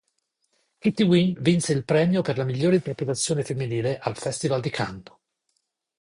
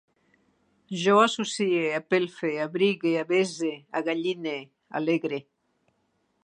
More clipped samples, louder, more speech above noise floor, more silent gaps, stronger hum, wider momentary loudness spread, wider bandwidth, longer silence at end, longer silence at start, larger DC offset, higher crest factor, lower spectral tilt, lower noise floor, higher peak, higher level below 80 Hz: neither; about the same, -24 LUFS vs -26 LUFS; first, 52 dB vs 47 dB; neither; neither; second, 9 LU vs 12 LU; about the same, 11 kHz vs 10.5 kHz; about the same, 1 s vs 1.05 s; about the same, 0.85 s vs 0.9 s; neither; about the same, 18 dB vs 20 dB; about the same, -5.5 dB/octave vs -4.5 dB/octave; about the same, -75 dBFS vs -72 dBFS; about the same, -8 dBFS vs -6 dBFS; first, -58 dBFS vs -80 dBFS